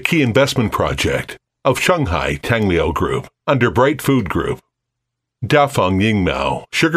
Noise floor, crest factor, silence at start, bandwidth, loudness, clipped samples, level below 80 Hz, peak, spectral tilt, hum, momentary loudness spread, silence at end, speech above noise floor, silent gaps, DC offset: -78 dBFS; 16 dB; 0 s; 16 kHz; -17 LUFS; under 0.1%; -36 dBFS; 0 dBFS; -5.5 dB/octave; none; 7 LU; 0 s; 62 dB; none; under 0.1%